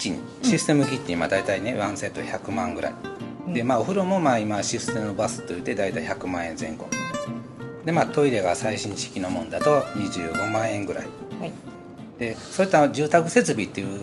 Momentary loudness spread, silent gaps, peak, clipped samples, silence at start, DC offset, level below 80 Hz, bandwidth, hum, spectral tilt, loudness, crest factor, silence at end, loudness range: 14 LU; none; -2 dBFS; under 0.1%; 0 s; under 0.1%; -58 dBFS; 12 kHz; none; -5 dB/octave; -25 LUFS; 22 dB; 0 s; 3 LU